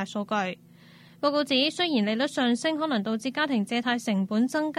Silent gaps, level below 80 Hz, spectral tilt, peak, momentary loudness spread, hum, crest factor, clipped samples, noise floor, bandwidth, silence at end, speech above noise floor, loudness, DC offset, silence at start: none; -76 dBFS; -4.5 dB/octave; -10 dBFS; 6 LU; none; 16 dB; under 0.1%; -52 dBFS; 13.5 kHz; 0 s; 26 dB; -26 LUFS; under 0.1%; 0 s